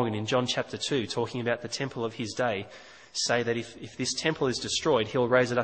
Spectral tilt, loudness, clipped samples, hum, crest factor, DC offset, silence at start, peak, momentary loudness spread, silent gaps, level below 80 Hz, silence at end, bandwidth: -4 dB/octave; -28 LUFS; under 0.1%; none; 20 dB; under 0.1%; 0 s; -8 dBFS; 8 LU; none; -62 dBFS; 0 s; 8.8 kHz